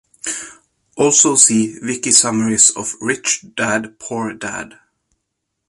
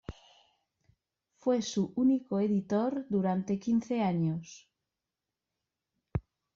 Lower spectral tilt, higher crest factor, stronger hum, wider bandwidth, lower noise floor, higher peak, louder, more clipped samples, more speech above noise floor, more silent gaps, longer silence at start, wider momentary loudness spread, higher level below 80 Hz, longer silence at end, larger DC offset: second, -2 dB/octave vs -7.5 dB/octave; about the same, 18 dB vs 16 dB; neither; first, 13.5 kHz vs 7.6 kHz; second, -75 dBFS vs -89 dBFS; first, 0 dBFS vs -18 dBFS; first, -14 LUFS vs -31 LUFS; neither; about the same, 59 dB vs 59 dB; neither; first, 0.25 s vs 0.1 s; first, 16 LU vs 11 LU; about the same, -58 dBFS vs -60 dBFS; first, 1 s vs 0.35 s; neither